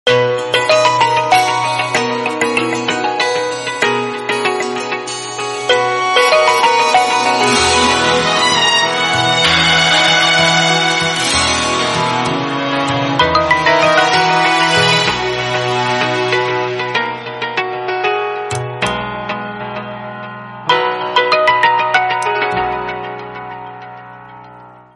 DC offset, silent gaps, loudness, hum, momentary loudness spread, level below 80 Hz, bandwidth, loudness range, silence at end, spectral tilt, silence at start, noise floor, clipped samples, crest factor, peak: under 0.1%; none; -13 LUFS; none; 12 LU; -46 dBFS; 11.5 kHz; 8 LU; 0.2 s; -2.5 dB/octave; 0.05 s; -38 dBFS; under 0.1%; 14 dB; 0 dBFS